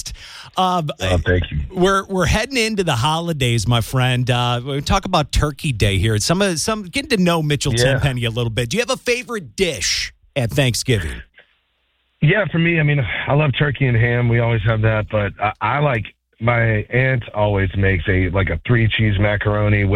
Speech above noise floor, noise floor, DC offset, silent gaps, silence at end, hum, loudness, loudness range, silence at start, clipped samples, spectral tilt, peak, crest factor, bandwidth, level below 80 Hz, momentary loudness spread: 48 dB; -65 dBFS; under 0.1%; none; 0 s; none; -18 LUFS; 2 LU; 0.05 s; under 0.1%; -5 dB/octave; -2 dBFS; 16 dB; 16 kHz; -32 dBFS; 5 LU